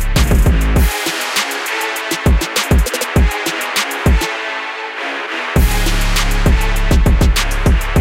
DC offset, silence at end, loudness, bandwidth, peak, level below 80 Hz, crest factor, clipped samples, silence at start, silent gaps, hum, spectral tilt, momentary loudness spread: under 0.1%; 0 s; -15 LUFS; 17 kHz; -2 dBFS; -16 dBFS; 12 dB; under 0.1%; 0 s; none; none; -4.5 dB/octave; 7 LU